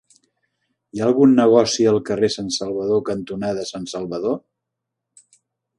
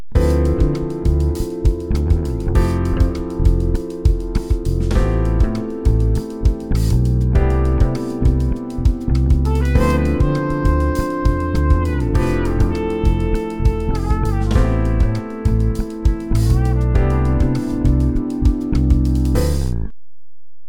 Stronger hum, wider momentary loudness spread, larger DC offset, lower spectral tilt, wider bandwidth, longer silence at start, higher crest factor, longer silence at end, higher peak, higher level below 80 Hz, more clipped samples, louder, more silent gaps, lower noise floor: neither; first, 14 LU vs 4 LU; neither; second, -5 dB/octave vs -8 dB/octave; second, 11.5 kHz vs 15 kHz; first, 0.95 s vs 0 s; about the same, 18 dB vs 14 dB; first, 1.4 s vs 0 s; about the same, -2 dBFS vs -2 dBFS; second, -58 dBFS vs -18 dBFS; neither; about the same, -19 LUFS vs -18 LUFS; neither; first, -81 dBFS vs -76 dBFS